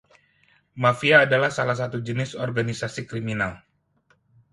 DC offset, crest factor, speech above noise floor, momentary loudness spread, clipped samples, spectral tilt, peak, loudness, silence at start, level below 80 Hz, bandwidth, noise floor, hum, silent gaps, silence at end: under 0.1%; 22 dB; 42 dB; 13 LU; under 0.1%; -5.5 dB/octave; -2 dBFS; -23 LUFS; 0.75 s; -58 dBFS; 11.5 kHz; -65 dBFS; none; none; 0.95 s